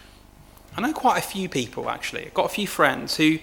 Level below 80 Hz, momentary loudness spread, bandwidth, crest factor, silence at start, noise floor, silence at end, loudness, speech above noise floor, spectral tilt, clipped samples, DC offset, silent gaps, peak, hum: -54 dBFS; 8 LU; 19 kHz; 22 dB; 0 s; -49 dBFS; 0 s; -24 LUFS; 25 dB; -4 dB/octave; under 0.1%; under 0.1%; none; -2 dBFS; 50 Hz at -50 dBFS